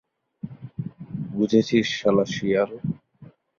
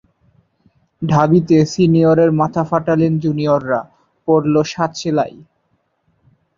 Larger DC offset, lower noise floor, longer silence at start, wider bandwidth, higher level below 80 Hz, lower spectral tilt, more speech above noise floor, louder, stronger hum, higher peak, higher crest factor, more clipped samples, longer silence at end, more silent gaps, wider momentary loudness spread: neither; second, -50 dBFS vs -65 dBFS; second, 0.45 s vs 1 s; about the same, 7.4 kHz vs 7.6 kHz; second, -60 dBFS vs -52 dBFS; second, -6 dB/octave vs -7.5 dB/octave; second, 29 dB vs 51 dB; second, -23 LUFS vs -15 LUFS; neither; second, -6 dBFS vs 0 dBFS; about the same, 20 dB vs 16 dB; neither; second, 0.35 s vs 1.3 s; neither; first, 17 LU vs 9 LU